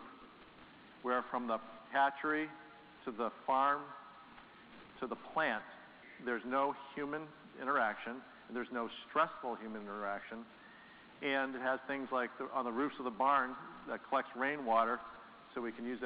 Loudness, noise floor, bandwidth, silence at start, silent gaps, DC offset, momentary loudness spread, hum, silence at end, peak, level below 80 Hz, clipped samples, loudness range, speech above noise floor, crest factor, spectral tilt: -38 LUFS; -58 dBFS; 5 kHz; 0 s; none; under 0.1%; 23 LU; none; 0 s; -18 dBFS; -78 dBFS; under 0.1%; 4 LU; 21 dB; 22 dB; -2 dB/octave